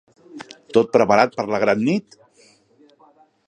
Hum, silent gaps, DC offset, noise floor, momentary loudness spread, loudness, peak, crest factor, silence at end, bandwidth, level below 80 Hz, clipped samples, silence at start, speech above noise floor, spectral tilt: none; none; under 0.1%; -55 dBFS; 23 LU; -18 LUFS; 0 dBFS; 20 dB; 1.5 s; 9.8 kHz; -62 dBFS; under 0.1%; 0.35 s; 37 dB; -6 dB/octave